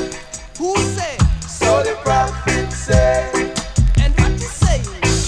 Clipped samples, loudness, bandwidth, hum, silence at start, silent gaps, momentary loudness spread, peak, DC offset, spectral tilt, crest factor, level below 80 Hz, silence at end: under 0.1%; -17 LUFS; 11 kHz; none; 0 s; none; 5 LU; 0 dBFS; under 0.1%; -5 dB/octave; 16 dB; -22 dBFS; 0 s